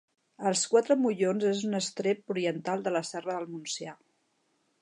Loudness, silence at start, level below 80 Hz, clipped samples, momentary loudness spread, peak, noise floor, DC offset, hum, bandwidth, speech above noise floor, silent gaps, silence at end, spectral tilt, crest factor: -29 LUFS; 0.4 s; -84 dBFS; under 0.1%; 11 LU; -12 dBFS; -74 dBFS; under 0.1%; none; 11 kHz; 45 dB; none; 0.9 s; -4 dB/octave; 20 dB